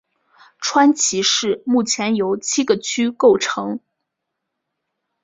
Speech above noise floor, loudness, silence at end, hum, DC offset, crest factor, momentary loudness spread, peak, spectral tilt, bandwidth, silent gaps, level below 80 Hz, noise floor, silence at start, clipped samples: 61 dB; -17 LUFS; 1.45 s; none; under 0.1%; 18 dB; 9 LU; -2 dBFS; -2.5 dB/octave; 8 kHz; none; -64 dBFS; -79 dBFS; 0.6 s; under 0.1%